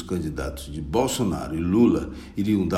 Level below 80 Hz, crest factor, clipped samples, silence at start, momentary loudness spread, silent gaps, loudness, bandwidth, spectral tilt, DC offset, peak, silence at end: -40 dBFS; 16 dB; under 0.1%; 0 s; 12 LU; none; -24 LUFS; 16 kHz; -6 dB/octave; under 0.1%; -6 dBFS; 0 s